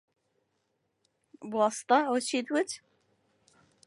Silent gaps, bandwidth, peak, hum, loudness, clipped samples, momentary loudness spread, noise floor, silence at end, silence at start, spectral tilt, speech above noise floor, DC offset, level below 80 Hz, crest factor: none; 11.5 kHz; -10 dBFS; none; -29 LUFS; under 0.1%; 14 LU; -78 dBFS; 1.1 s; 1.4 s; -3 dB/octave; 50 dB; under 0.1%; -82 dBFS; 22 dB